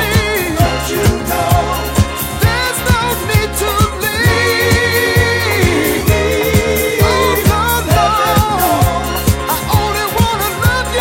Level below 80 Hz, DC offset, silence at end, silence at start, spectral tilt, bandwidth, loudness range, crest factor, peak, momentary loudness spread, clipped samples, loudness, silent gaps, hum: -24 dBFS; under 0.1%; 0 s; 0 s; -4.5 dB/octave; 17 kHz; 2 LU; 12 dB; 0 dBFS; 4 LU; under 0.1%; -13 LUFS; none; none